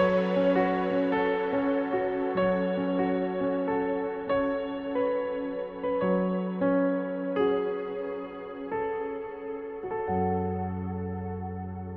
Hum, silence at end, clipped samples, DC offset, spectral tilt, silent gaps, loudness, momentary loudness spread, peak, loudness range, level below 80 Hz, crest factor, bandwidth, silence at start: none; 0 s; under 0.1%; under 0.1%; -9.5 dB/octave; none; -29 LUFS; 10 LU; -12 dBFS; 5 LU; -58 dBFS; 16 dB; 5.6 kHz; 0 s